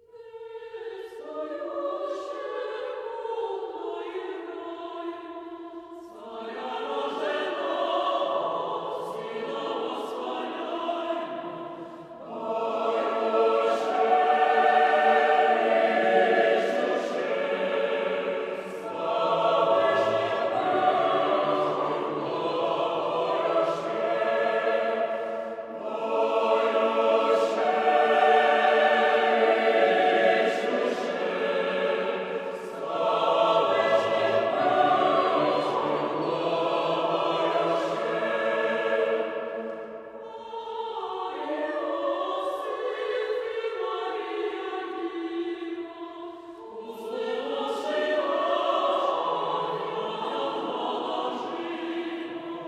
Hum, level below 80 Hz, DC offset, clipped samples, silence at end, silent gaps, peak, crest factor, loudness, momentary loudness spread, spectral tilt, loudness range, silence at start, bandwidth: none; -76 dBFS; under 0.1%; under 0.1%; 0 s; none; -8 dBFS; 18 dB; -26 LUFS; 15 LU; -4.5 dB/octave; 11 LU; 0.15 s; 11.5 kHz